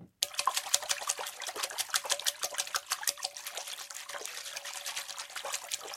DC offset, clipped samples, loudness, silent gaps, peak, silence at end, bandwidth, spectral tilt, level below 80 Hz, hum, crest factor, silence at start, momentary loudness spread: under 0.1%; under 0.1%; -34 LUFS; none; -4 dBFS; 0 s; 16.5 kHz; 2.5 dB/octave; -82 dBFS; none; 32 dB; 0 s; 10 LU